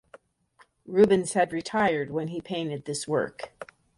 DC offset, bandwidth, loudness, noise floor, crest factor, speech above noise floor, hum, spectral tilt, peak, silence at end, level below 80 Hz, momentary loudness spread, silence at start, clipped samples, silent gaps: under 0.1%; 11.5 kHz; -26 LUFS; -62 dBFS; 20 dB; 36 dB; none; -5 dB/octave; -8 dBFS; 0.35 s; -64 dBFS; 14 LU; 0.85 s; under 0.1%; none